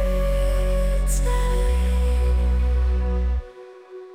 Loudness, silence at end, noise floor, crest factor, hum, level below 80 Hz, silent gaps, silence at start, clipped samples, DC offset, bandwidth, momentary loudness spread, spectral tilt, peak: -23 LUFS; 0 s; -42 dBFS; 8 dB; none; -20 dBFS; none; 0 s; under 0.1%; under 0.1%; 15.5 kHz; 12 LU; -6 dB/octave; -12 dBFS